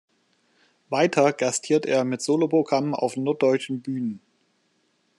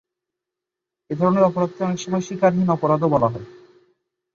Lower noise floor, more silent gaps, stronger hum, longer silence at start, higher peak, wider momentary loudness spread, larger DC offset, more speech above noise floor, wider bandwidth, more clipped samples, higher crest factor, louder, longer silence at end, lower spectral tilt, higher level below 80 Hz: second, -68 dBFS vs -85 dBFS; neither; neither; second, 0.9 s vs 1.1 s; about the same, -6 dBFS vs -4 dBFS; about the same, 9 LU vs 8 LU; neither; second, 46 dB vs 66 dB; first, 12 kHz vs 7.2 kHz; neither; about the same, 20 dB vs 18 dB; second, -23 LUFS vs -20 LUFS; first, 1 s vs 0.85 s; second, -5 dB/octave vs -7.5 dB/octave; second, -76 dBFS vs -56 dBFS